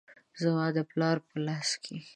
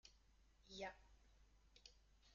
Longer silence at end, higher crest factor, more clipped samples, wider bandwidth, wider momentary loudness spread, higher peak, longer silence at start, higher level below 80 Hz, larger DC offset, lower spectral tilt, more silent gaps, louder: about the same, 0.05 s vs 0 s; second, 18 dB vs 24 dB; neither; first, 11 kHz vs 7.2 kHz; second, 5 LU vs 15 LU; first, -14 dBFS vs -38 dBFS; about the same, 0.1 s vs 0.05 s; second, -78 dBFS vs -72 dBFS; neither; first, -5 dB/octave vs -1.5 dB/octave; neither; first, -31 LUFS vs -58 LUFS